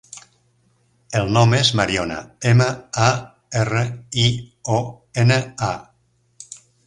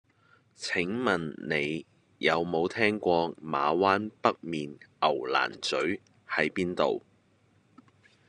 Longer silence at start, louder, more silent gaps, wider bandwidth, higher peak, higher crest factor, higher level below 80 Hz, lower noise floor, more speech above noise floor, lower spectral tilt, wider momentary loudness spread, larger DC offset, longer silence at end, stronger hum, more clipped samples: second, 0.15 s vs 0.6 s; first, -19 LUFS vs -29 LUFS; neither; about the same, 11 kHz vs 11 kHz; first, 0 dBFS vs -8 dBFS; about the same, 20 dB vs 22 dB; first, -48 dBFS vs -68 dBFS; second, -62 dBFS vs -66 dBFS; first, 44 dB vs 37 dB; about the same, -5 dB/octave vs -5 dB/octave; first, 15 LU vs 10 LU; neither; second, 0.3 s vs 1.3 s; neither; neither